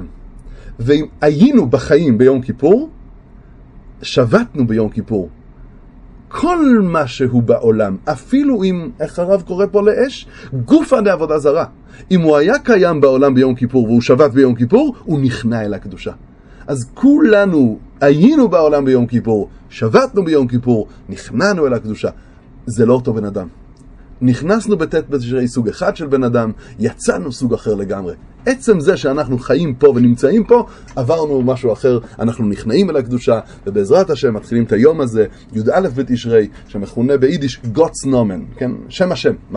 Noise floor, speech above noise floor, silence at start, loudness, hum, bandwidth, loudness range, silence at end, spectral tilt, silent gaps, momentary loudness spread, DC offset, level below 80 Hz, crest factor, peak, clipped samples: -39 dBFS; 26 dB; 0 s; -14 LUFS; none; 11 kHz; 5 LU; 0 s; -7 dB/octave; none; 12 LU; under 0.1%; -40 dBFS; 14 dB; 0 dBFS; under 0.1%